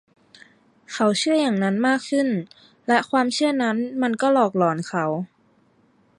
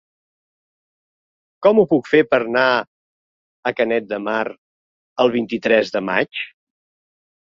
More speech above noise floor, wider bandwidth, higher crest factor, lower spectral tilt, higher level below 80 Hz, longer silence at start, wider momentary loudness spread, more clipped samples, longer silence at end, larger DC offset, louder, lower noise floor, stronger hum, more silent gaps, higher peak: second, 39 dB vs over 73 dB; first, 11.5 kHz vs 7.4 kHz; about the same, 18 dB vs 18 dB; about the same, -5 dB/octave vs -6 dB/octave; second, -72 dBFS vs -64 dBFS; second, 0.9 s vs 1.6 s; about the same, 10 LU vs 12 LU; neither; about the same, 0.9 s vs 1 s; neither; second, -21 LUFS vs -18 LUFS; second, -60 dBFS vs under -90 dBFS; neither; second, none vs 2.87-3.63 s, 4.58-5.16 s; about the same, -4 dBFS vs -2 dBFS